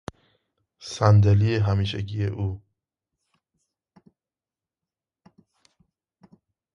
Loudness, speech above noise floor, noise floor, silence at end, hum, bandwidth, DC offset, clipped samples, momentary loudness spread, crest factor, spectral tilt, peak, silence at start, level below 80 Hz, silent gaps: -22 LUFS; over 69 dB; under -90 dBFS; 4.15 s; none; 7.4 kHz; under 0.1%; under 0.1%; 23 LU; 24 dB; -7 dB/octave; -4 dBFS; 0.8 s; -44 dBFS; none